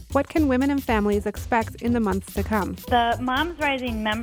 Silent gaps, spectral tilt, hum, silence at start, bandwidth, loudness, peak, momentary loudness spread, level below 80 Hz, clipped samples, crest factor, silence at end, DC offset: none; -5.5 dB/octave; none; 0 s; over 20 kHz; -23 LUFS; -8 dBFS; 4 LU; -38 dBFS; under 0.1%; 16 dB; 0 s; under 0.1%